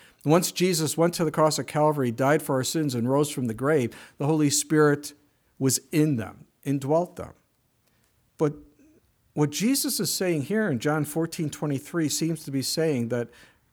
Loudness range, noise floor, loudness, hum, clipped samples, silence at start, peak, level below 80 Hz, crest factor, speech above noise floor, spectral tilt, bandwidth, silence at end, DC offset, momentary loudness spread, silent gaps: 5 LU; -68 dBFS; -25 LUFS; none; under 0.1%; 0.25 s; -8 dBFS; -64 dBFS; 18 dB; 43 dB; -5 dB/octave; over 20 kHz; 0.45 s; under 0.1%; 8 LU; none